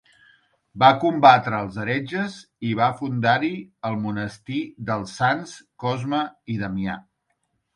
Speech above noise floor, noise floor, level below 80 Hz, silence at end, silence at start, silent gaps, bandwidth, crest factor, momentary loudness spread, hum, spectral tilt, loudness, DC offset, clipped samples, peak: 51 dB; -73 dBFS; -58 dBFS; 0.75 s; 0.75 s; none; 11 kHz; 22 dB; 14 LU; none; -6 dB/octave; -22 LUFS; under 0.1%; under 0.1%; 0 dBFS